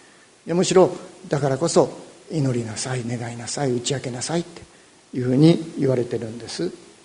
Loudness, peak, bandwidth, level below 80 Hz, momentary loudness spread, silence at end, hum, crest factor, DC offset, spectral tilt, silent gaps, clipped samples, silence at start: -22 LUFS; -2 dBFS; 11 kHz; -60 dBFS; 13 LU; 0.3 s; none; 20 dB; under 0.1%; -5.5 dB/octave; none; under 0.1%; 0.45 s